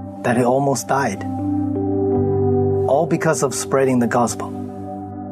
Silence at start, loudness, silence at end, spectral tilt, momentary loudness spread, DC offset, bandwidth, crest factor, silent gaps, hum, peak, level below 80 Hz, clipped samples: 0 s; -19 LUFS; 0 s; -6 dB/octave; 12 LU; under 0.1%; 13.5 kHz; 14 dB; none; none; -6 dBFS; -52 dBFS; under 0.1%